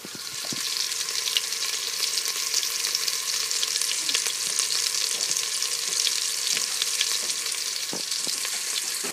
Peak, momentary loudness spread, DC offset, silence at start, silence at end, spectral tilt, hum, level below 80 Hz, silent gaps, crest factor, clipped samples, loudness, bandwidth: -2 dBFS; 4 LU; under 0.1%; 0 s; 0 s; 2 dB/octave; none; -82 dBFS; none; 24 dB; under 0.1%; -24 LUFS; 16 kHz